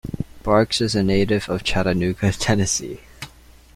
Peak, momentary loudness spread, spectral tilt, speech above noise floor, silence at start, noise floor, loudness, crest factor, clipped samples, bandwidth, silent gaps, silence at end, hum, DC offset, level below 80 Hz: -2 dBFS; 17 LU; -4.5 dB/octave; 27 dB; 0.05 s; -47 dBFS; -20 LUFS; 18 dB; under 0.1%; 15.5 kHz; none; 0.5 s; none; under 0.1%; -38 dBFS